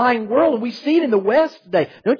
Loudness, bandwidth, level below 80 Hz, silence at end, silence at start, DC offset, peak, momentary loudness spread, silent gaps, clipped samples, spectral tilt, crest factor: -18 LUFS; 5.4 kHz; -64 dBFS; 0 s; 0 s; under 0.1%; -4 dBFS; 5 LU; none; under 0.1%; -7 dB/octave; 14 dB